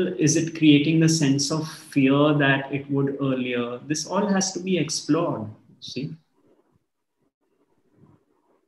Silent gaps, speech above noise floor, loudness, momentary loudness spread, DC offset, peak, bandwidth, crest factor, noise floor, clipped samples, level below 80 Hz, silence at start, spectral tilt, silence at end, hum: none; 52 dB; -22 LUFS; 15 LU; under 0.1%; -4 dBFS; 12.5 kHz; 18 dB; -74 dBFS; under 0.1%; -68 dBFS; 0 s; -5 dB/octave; 2.5 s; none